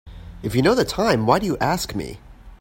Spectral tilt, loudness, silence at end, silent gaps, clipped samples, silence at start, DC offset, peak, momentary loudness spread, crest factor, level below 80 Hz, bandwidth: -5.5 dB/octave; -20 LUFS; 0.05 s; none; under 0.1%; 0.05 s; under 0.1%; -2 dBFS; 13 LU; 20 dB; -42 dBFS; 16.5 kHz